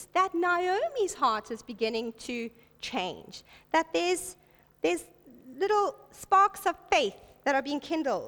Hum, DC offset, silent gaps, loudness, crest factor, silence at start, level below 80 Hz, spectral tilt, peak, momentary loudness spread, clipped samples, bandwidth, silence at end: none; under 0.1%; none; -29 LUFS; 18 dB; 0 s; -64 dBFS; -2.5 dB/octave; -10 dBFS; 15 LU; under 0.1%; 19 kHz; 0 s